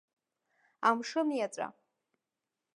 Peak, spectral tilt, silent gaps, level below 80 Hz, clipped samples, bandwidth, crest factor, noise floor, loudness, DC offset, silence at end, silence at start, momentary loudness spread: -12 dBFS; -3.5 dB/octave; none; under -90 dBFS; under 0.1%; 11 kHz; 24 dB; -89 dBFS; -33 LUFS; under 0.1%; 1.05 s; 0.8 s; 11 LU